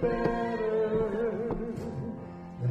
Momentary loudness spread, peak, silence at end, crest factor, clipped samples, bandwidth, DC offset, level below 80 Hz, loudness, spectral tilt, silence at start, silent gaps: 11 LU; -14 dBFS; 0 s; 16 dB; under 0.1%; 8.2 kHz; under 0.1%; -48 dBFS; -31 LUFS; -8.5 dB/octave; 0 s; none